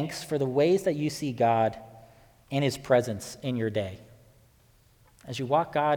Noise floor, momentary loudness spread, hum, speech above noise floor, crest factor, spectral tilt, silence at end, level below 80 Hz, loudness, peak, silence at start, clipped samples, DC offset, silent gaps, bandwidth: -61 dBFS; 12 LU; none; 34 dB; 20 dB; -6 dB/octave; 0 s; -62 dBFS; -27 LUFS; -10 dBFS; 0 s; under 0.1%; under 0.1%; none; 19 kHz